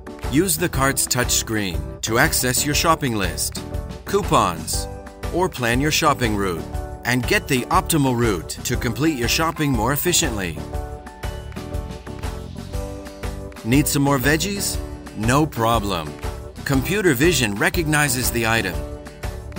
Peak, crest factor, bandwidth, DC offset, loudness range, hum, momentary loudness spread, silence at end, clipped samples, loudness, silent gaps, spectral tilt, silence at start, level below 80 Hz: -2 dBFS; 18 dB; 16.5 kHz; under 0.1%; 4 LU; none; 14 LU; 0 s; under 0.1%; -20 LUFS; none; -4 dB/octave; 0 s; -32 dBFS